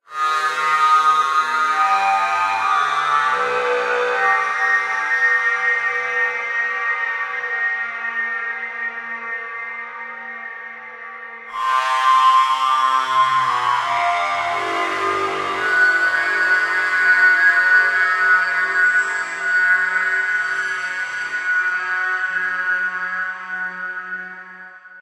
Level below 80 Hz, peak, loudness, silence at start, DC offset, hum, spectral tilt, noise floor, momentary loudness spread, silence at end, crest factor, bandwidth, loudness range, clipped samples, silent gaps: -70 dBFS; -4 dBFS; -17 LUFS; 0.1 s; under 0.1%; none; -1 dB/octave; -39 dBFS; 14 LU; 0 s; 16 dB; 13.5 kHz; 8 LU; under 0.1%; none